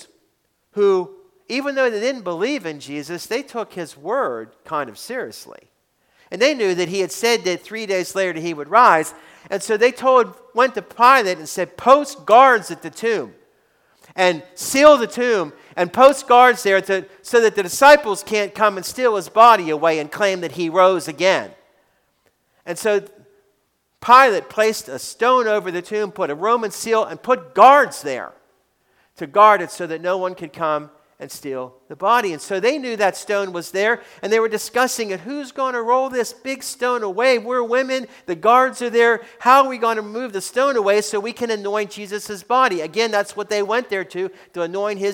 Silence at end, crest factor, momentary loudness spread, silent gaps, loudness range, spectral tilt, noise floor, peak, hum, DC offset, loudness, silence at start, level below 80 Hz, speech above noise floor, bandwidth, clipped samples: 0 s; 18 dB; 16 LU; none; 7 LU; -3 dB/octave; -67 dBFS; 0 dBFS; none; under 0.1%; -18 LUFS; 0.75 s; -64 dBFS; 50 dB; 18 kHz; under 0.1%